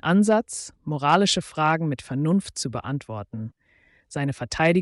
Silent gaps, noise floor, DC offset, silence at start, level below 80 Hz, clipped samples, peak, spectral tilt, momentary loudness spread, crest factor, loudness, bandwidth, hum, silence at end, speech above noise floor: none; -61 dBFS; under 0.1%; 0.05 s; -54 dBFS; under 0.1%; -10 dBFS; -5 dB/octave; 15 LU; 14 dB; -24 LUFS; 11.5 kHz; none; 0 s; 38 dB